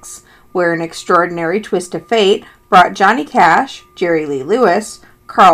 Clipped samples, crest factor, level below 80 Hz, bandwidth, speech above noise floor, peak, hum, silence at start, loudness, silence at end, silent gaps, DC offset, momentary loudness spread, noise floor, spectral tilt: 0.2%; 14 dB; -52 dBFS; 15.5 kHz; 23 dB; 0 dBFS; none; 0.05 s; -13 LUFS; 0 s; none; under 0.1%; 10 LU; -36 dBFS; -4.5 dB/octave